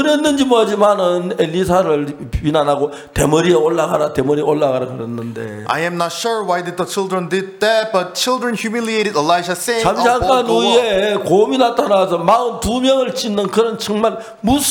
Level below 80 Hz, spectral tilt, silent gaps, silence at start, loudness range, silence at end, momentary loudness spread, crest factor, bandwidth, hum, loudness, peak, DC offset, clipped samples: -38 dBFS; -4.5 dB/octave; none; 0 s; 5 LU; 0 s; 7 LU; 14 dB; 19 kHz; none; -16 LUFS; -2 dBFS; under 0.1%; under 0.1%